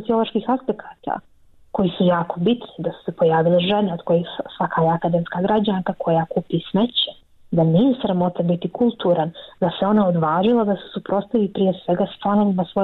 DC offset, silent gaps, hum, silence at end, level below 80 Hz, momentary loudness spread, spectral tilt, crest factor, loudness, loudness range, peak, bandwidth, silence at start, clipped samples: under 0.1%; none; none; 0 s; -56 dBFS; 9 LU; -10 dB/octave; 12 dB; -20 LUFS; 2 LU; -8 dBFS; 4.2 kHz; 0 s; under 0.1%